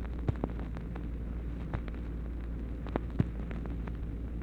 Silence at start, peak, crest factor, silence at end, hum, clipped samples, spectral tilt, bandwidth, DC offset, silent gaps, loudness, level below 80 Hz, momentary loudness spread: 0 s; -12 dBFS; 24 dB; 0 s; none; under 0.1%; -9.5 dB/octave; 4.5 kHz; under 0.1%; none; -38 LUFS; -38 dBFS; 6 LU